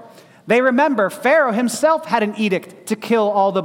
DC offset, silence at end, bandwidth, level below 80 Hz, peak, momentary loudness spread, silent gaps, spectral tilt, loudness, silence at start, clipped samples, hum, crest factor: under 0.1%; 0 s; 17 kHz; -68 dBFS; -2 dBFS; 6 LU; none; -5 dB/octave; -17 LUFS; 0 s; under 0.1%; none; 14 dB